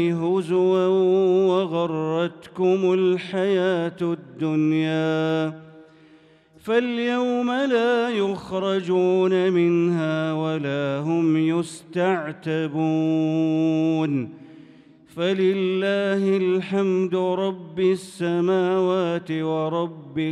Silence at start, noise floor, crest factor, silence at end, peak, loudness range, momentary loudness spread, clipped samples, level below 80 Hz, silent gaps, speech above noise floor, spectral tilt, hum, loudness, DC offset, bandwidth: 0 s; -53 dBFS; 14 dB; 0 s; -8 dBFS; 3 LU; 7 LU; under 0.1%; -68 dBFS; none; 32 dB; -7 dB/octave; none; -22 LUFS; under 0.1%; 11 kHz